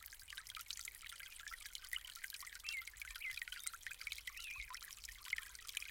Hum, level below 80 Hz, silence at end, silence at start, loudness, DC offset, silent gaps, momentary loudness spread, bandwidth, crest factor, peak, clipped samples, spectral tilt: none; -68 dBFS; 0 s; 0 s; -48 LUFS; under 0.1%; none; 6 LU; 17 kHz; 26 dB; -24 dBFS; under 0.1%; 2.5 dB/octave